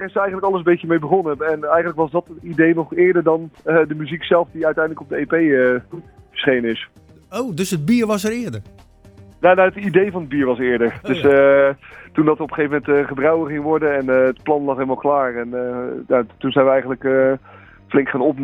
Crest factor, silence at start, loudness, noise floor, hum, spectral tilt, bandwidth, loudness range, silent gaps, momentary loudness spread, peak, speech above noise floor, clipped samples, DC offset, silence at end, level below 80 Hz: 18 dB; 0 s; -18 LUFS; -44 dBFS; none; -6.5 dB/octave; 16.5 kHz; 4 LU; none; 10 LU; 0 dBFS; 27 dB; under 0.1%; under 0.1%; 0 s; -52 dBFS